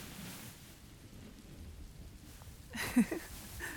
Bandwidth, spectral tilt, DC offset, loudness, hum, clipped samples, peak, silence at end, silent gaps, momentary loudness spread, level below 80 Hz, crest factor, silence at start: 19.5 kHz; -4.5 dB/octave; under 0.1%; -38 LUFS; none; under 0.1%; -18 dBFS; 0 s; none; 21 LU; -56 dBFS; 24 dB; 0 s